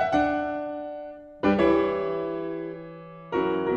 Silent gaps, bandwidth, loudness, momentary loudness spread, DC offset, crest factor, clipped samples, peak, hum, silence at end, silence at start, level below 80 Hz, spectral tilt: none; 7.6 kHz; -26 LUFS; 18 LU; under 0.1%; 16 dB; under 0.1%; -10 dBFS; none; 0 s; 0 s; -52 dBFS; -7.5 dB/octave